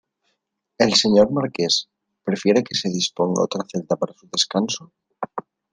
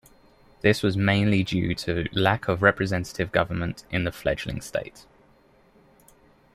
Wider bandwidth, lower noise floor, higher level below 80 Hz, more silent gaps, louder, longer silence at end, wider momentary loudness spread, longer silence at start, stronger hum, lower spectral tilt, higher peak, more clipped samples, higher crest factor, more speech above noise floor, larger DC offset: second, 10 kHz vs 15 kHz; first, -75 dBFS vs -58 dBFS; second, -58 dBFS vs -48 dBFS; neither; first, -20 LUFS vs -25 LUFS; second, 0.3 s vs 1.55 s; first, 15 LU vs 9 LU; first, 0.8 s vs 0.65 s; neither; second, -4 dB/octave vs -6 dB/octave; about the same, -2 dBFS vs -4 dBFS; neither; about the same, 20 dB vs 22 dB; first, 55 dB vs 34 dB; neither